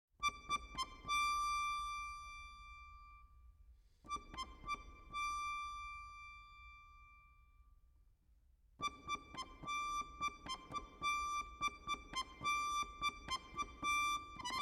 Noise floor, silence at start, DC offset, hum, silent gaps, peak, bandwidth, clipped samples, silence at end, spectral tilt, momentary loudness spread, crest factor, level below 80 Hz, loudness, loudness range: -71 dBFS; 0.2 s; under 0.1%; none; none; -28 dBFS; 16 kHz; under 0.1%; 0 s; -1 dB/octave; 18 LU; 18 dB; -62 dBFS; -42 LUFS; 10 LU